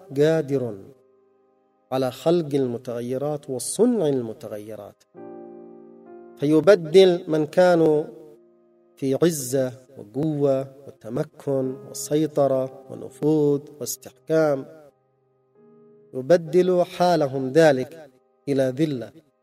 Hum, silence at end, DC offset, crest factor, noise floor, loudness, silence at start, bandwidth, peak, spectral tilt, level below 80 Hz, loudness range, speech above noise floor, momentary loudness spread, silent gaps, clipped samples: none; 0.35 s; under 0.1%; 20 dB; -65 dBFS; -22 LUFS; 0.1 s; 16 kHz; -2 dBFS; -6 dB/octave; -68 dBFS; 6 LU; 44 dB; 20 LU; none; under 0.1%